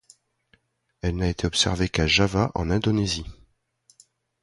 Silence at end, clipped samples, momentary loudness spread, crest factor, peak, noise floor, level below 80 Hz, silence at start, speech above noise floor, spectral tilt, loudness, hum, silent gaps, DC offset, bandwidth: 1.1 s; under 0.1%; 10 LU; 20 dB; -6 dBFS; -65 dBFS; -38 dBFS; 1.05 s; 42 dB; -4.5 dB/octave; -23 LUFS; none; none; under 0.1%; 11.5 kHz